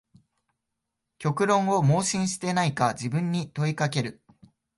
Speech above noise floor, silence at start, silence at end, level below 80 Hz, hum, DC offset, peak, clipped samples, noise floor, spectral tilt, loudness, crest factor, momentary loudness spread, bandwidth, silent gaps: 58 dB; 1.2 s; 0.65 s; -64 dBFS; none; under 0.1%; -8 dBFS; under 0.1%; -83 dBFS; -5 dB/octave; -26 LUFS; 18 dB; 8 LU; 11.5 kHz; none